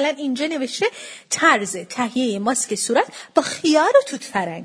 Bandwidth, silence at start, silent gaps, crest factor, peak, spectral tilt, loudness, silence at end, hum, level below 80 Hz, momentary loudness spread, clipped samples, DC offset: 11 kHz; 0 s; none; 20 dB; 0 dBFS; -2.5 dB/octave; -20 LUFS; 0 s; none; -70 dBFS; 9 LU; under 0.1%; under 0.1%